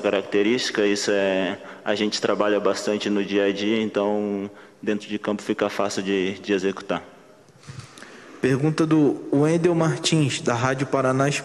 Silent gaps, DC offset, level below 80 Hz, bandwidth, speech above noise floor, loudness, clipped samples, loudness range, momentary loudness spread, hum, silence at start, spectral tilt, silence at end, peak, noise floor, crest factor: none; under 0.1%; -64 dBFS; 12.5 kHz; 28 dB; -23 LUFS; under 0.1%; 5 LU; 10 LU; none; 0 s; -5 dB/octave; 0 s; -6 dBFS; -50 dBFS; 16 dB